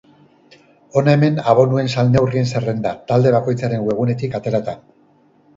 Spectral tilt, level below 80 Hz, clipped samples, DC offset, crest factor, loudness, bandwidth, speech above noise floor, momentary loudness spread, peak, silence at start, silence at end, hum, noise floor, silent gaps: -7.5 dB/octave; -50 dBFS; under 0.1%; under 0.1%; 18 dB; -17 LUFS; 7.8 kHz; 38 dB; 8 LU; 0 dBFS; 0.95 s; 0.8 s; none; -54 dBFS; none